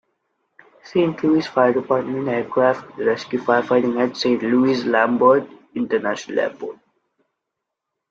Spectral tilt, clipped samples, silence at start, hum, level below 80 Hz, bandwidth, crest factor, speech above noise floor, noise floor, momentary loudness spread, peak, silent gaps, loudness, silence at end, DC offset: -6 dB/octave; under 0.1%; 0.85 s; none; -64 dBFS; 7.6 kHz; 18 dB; 62 dB; -81 dBFS; 7 LU; -2 dBFS; none; -19 LUFS; 1.35 s; under 0.1%